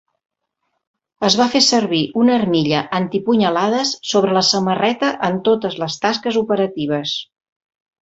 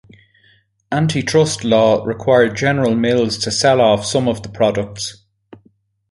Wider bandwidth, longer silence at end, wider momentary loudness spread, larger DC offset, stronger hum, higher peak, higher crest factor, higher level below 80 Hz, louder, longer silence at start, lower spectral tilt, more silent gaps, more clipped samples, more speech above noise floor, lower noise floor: second, 8 kHz vs 11.5 kHz; second, 0.75 s vs 1 s; about the same, 7 LU vs 9 LU; neither; neither; about the same, 0 dBFS vs -2 dBFS; about the same, 18 dB vs 16 dB; second, -58 dBFS vs -48 dBFS; about the same, -17 LUFS vs -16 LUFS; first, 1.2 s vs 0.9 s; about the same, -4 dB/octave vs -5 dB/octave; neither; neither; first, 56 dB vs 41 dB; first, -73 dBFS vs -57 dBFS